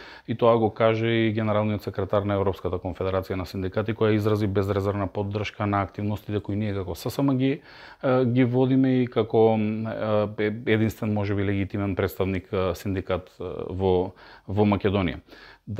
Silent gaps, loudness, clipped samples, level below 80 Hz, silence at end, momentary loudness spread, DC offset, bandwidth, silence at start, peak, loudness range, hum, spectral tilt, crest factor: none; -25 LUFS; under 0.1%; -52 dBFS; 0 s; 9 LU; under 0.1%; 15.5 kHz; 0 s; -6 dBFS; 4 LU; none; -8 dB/octave; 18 dB